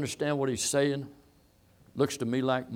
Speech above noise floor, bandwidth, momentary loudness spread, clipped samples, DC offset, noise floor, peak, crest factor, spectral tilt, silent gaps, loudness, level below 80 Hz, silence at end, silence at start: 33 dB; 17 kHz; 12 LU; under 0.1%; under 0.1%; -62 dBFS; -14 dBFS; 18 dB; -4.5 dB/octave; none; -29 LUFS; -66 dBFS; 0 s; 0 s